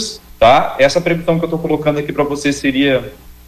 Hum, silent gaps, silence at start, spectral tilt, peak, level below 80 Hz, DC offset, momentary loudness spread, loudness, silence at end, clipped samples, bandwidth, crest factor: none; none; 0 s; -5 dB/octave; 0 dBFS; -40 dBFS; under 0.1%; 8 LU; -14 LUFS; 0.15 s; under 0.1%; 15 kHz; 14 dB